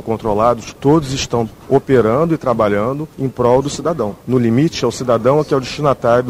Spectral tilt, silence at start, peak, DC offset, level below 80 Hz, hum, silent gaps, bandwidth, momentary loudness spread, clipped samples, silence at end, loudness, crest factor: -6.5 dB/octave; 0 s; 0 dBFS; under 0.1%; -40 dBFS; none; none; 16 kHz; 6 LU; under 0.1%; 0 s; -16 LUFS; 14 dB